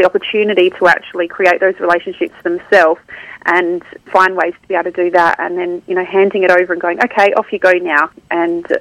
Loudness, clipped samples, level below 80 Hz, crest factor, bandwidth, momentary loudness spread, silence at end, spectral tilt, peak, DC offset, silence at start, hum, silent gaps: -13 LUFS; 0.2%; -56 dBFS; 14 dB; 11 kHz; 9 LU; 0 s; -5 dB/octave; 0 dBFS; under 0.1%; 0 s; none; none